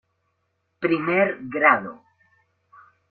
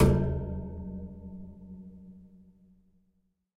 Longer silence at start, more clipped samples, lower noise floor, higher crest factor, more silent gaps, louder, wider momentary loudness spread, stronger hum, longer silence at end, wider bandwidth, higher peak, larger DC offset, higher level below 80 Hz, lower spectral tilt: first, 0.8 s vs 0 s; neither; about the same, -73 dBFS vs -73 dBFS; about the same, 22 dB vs 22 dB; neither; first, -21 LUFS vs -33 LUFS; second, 9 LU vs 22 LU; neither; second, 1.15 s vs 1.3 s; second, 4.6 kHz vs 14.5 kHz; first, -2 dBFS vs -10 dBFS; neither; second, -70 dBFS vs -40 dBFS; about the same, -9 dB/octave vs -8 dB/octave